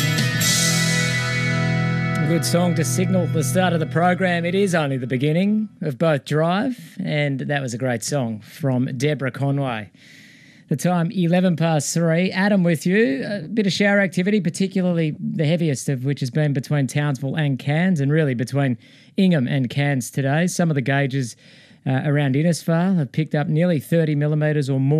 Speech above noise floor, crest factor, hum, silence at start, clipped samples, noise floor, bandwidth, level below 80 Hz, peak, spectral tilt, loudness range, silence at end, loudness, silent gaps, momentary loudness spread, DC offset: 27 dB; 14 dB; none; 0 s; under 0.1%; -47 dBFS; 14.5 kHz; -60 dBFS; -6 dBFS; -5.5 dB/octave; 4 LU; 0 s; -20 LUFS; none; 6 LU; under 0.1%